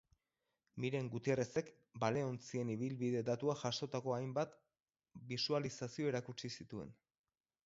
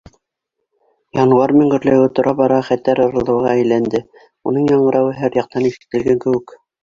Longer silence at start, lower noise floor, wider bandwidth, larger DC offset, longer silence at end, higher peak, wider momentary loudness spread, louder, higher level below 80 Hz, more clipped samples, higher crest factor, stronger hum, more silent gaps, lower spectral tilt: second, 0.75 s vs 1.15 s; first, under -90 dBFS vs -76 dBFS; about the same, 7.6 kHz vs 7.4 kHz; neither; first, 0.75 s vs 0.4 s; second, -20 dBFS vs -2 dBFS; about the same, 10 LU vs 8 LU; second, -41 LUFS vs -15 LUFS; second, -76 dBFS vs -52 dBFS; neither; first, 22 dB vs 14 dB; neither; neither; second, -5 dB/octave vs -8 dB/octave